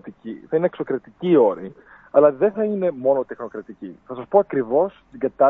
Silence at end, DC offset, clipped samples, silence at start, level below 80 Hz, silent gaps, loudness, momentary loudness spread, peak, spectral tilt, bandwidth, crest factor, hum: 0 s; under 0.1%; under 0.1%; 0.05 s; -64 dBFS; none; -20 LUFS; 18 LU; -2 dBFS; -10 dB/octave; 3.9 kHz; 20 dB; none